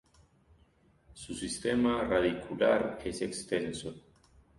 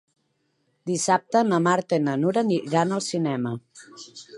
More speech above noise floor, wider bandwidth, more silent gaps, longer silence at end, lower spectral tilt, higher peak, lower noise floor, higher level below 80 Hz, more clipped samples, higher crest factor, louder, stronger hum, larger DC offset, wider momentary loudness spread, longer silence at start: second, 35 dB vs 48 dB; about the same, 11.5 kHz vs 11.5 kHz; neither; first, 0.6 s vs 0 s; about the same, -4.5 dB/octave vs -5 dB/octave; second, -14 dBFS vs -6 dBFS; second, -66 dBFS vs -71 dBFS; first, -56 dBFS vs -72 dBFS; neither; about the same, 18 dB vs 20 dB; second, -32 LUFS vs -23 LUFS; neither; neither; about the same, 14 LU vs 16 LU; first, 1.1 s vs 0.85 s